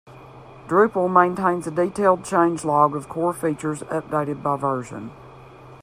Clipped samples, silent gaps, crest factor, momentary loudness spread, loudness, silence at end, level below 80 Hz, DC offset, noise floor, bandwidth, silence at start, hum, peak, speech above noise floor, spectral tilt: under 0.1%; none; 20 dB; 10 LU; -21 LUFS; 0.05 s; -58 dBFS; under 0.1%; -44 dBFS; 15 kHz; 0.05 s; none; -2 dBFS; 23 dB; -6.5 dB/octave